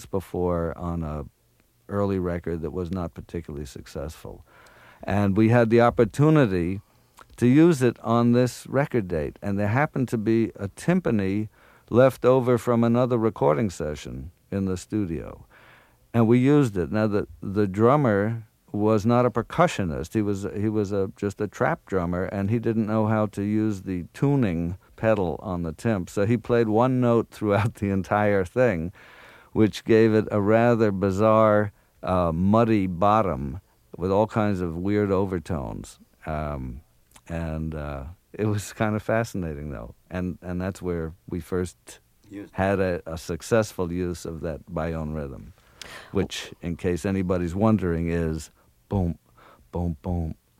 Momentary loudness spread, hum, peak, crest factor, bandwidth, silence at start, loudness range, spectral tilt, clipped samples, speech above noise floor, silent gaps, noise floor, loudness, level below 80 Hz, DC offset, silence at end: 16 LU; none; -4 dBFS; 20 dB; 16 kHz; 0 s; 9 LU; -7.5 dB/octave; under 0.1%; 40 dB; none; -63 dBFS; -24 LUFS; -46 dBFS; under 0.1%; 0.25 s